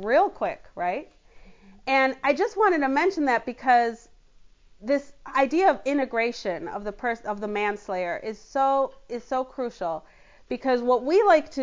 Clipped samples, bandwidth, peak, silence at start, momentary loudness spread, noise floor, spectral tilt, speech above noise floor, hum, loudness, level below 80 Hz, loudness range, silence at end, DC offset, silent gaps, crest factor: under 0.1%; 7.6 kHz; -8 dBFS; 0 s; 11 LU; -53 dBFS; -4.5 dB/octave; 29 dB; none; -25 LUFS; -58 dBFS; 4 LU; 0 s; under 0.1%; none; 18 dB